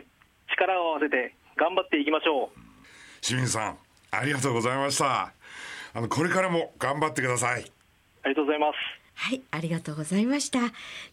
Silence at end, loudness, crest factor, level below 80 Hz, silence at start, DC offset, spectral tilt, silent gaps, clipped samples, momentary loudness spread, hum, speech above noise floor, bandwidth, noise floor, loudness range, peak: 0.05 s; -27 LUFS; 22 dB; -68 dBFS; 0.5 s; under 0.1%; -4 dB/octave; none; under 0.1%; 9 LU; none; 30 dB; 16 kHz; -57 dBFS; 2 LU; -6 dBFS